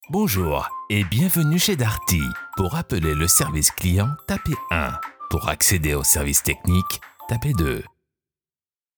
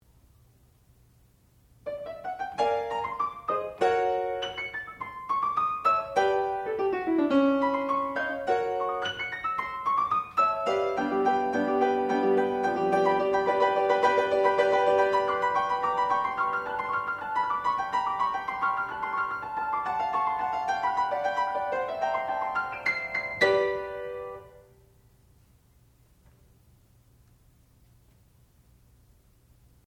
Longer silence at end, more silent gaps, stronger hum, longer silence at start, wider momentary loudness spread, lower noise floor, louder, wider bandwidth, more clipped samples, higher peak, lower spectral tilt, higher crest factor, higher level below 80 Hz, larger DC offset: second, 1.1 s vs 5.3 s; neither; neither; second, 0 s vs 1.85 s; about the same, 10 LU vs 8 LU; first, under -90 dBFS vs -61 dBFS; first, -21 LUFS vs -27 LUFS; first, over 20 kHz vs 12 kHz; neither; first, -2 dBFS vs -10 dBFS; about the same, -4 dB/octave vs -5 dB/octave; about the same, 20 dB vs 20 dB; first, -34 dBFS vs -62 dBFS; neither